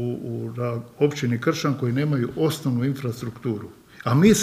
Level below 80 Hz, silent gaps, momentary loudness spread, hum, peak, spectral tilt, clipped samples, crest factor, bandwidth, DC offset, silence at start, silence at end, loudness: -54 dBFS; none; 8 LU; none; -4 dBFS; -6 dB/octave; under 0.1%; 20 dB; 15.5 kHz; under 0.1%; 0 s; 0 s; -24 LUFS